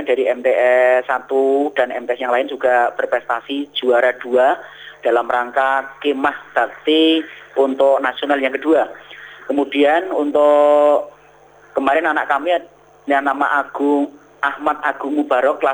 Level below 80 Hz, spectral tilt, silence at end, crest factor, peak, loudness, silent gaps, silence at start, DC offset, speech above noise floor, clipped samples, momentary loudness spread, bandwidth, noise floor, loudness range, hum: -64 dBFS; -4 dB/octave; 0 s; 14 dB; -2 dBFS; -17 LUFS; none; 0 s; under 0.1%; 31 dB; under 0.1%; 9 LU; over 20 kHz; -47 dBFS; 3 LU; 50 Hz at -60 dBFS